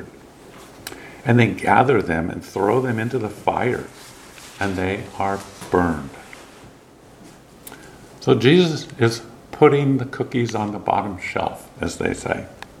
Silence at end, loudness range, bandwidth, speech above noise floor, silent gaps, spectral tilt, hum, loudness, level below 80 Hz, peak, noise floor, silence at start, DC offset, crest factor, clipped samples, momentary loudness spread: 0.15 s; 7 LU; 16 kHz; 27 dB; none; -6 dB/octave; none; -20 LUFS; -50 dBFS; 0 dBFS; -47 dBFS; 0 s; under 0.1%; 20 dB; under 0.1%; 24 LU